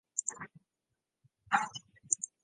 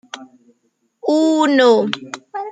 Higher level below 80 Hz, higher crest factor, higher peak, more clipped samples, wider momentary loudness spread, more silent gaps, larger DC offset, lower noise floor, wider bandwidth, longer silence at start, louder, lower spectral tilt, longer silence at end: second, -80 dBFS vs -72 dBFS; first, 32 dB vs 16 dB; second, -8 dBFS vs -2 dBFS; neither; second, 16 LU vs 19 LU; neither; neither; first, -87 dBFS vs -66 dBFS; first, 10.5 kHz vs 9.2 kHz; about the same, 0.15 s vs 0.15 s; second, -35 LUFS vs -15 LUFS; second, 0 dB/octave vs -4.5 dB/octave; first, 0.15 s vs 0 s